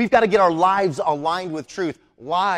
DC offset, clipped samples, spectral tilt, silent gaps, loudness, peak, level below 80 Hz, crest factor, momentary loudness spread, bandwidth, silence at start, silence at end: under 0.1%; under 0.1%; -5.5 dB/octave; none; -20 LUFS; -4 dBFS; -56 dBFS; 16 dB; 12 LU; 12 kHz; 0 s; 0 s